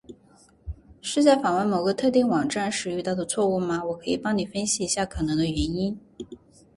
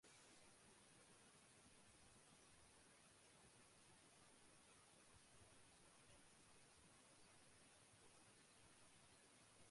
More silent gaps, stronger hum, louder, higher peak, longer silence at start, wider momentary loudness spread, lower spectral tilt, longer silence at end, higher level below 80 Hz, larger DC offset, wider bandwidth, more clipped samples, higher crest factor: neither; neither; first, -24 LUFS vs -69 LUFS; first, -8 dBFS vs -56 dBFS; about the same, 0.1 s vs 0 s; first, 20 LU vs 1 LU; first, -4.5 dB/octave vs -2.5 dB/octave; first, 0.4 s vs 0 s; first, -46 dBFS vs -86 dBFS; neither; about the same, 11.5 kHz vs 11.5 kHz; neither; about the same, 18 dB vs 16 dB